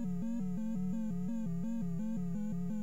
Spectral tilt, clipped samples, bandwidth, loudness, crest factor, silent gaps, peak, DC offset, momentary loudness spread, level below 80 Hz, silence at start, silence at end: -9 dB/octave; under 0.1%; 8 kHz; -38 LUFS; 6 dB; none; -28 dBFS; 0.9%; 1 LU; -60 dBFS; 0 s; 0 s